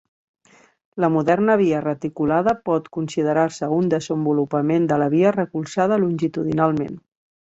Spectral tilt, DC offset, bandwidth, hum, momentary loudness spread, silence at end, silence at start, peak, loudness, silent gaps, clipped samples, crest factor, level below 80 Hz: -7.5 dB/octave; under 0.1%; 8 kHz; none; 7 LU; 0.4 s; 0.95 s; -4 dBFS; -20 LUFS; none; under 0.1%; 16 dB; -58 dBFS